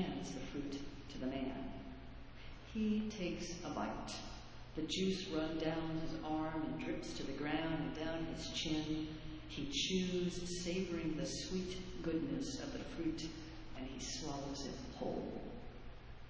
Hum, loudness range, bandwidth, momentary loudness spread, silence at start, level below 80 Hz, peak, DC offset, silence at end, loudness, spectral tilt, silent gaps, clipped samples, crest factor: none; 4 LU; 8 kHz; 13 LU; 0 s; -56 dBFS; -24 dBFS; under 0.1%; 0 s; -42 LUFS; -4.5 dB/octave; none; under 0.1%; 18 dB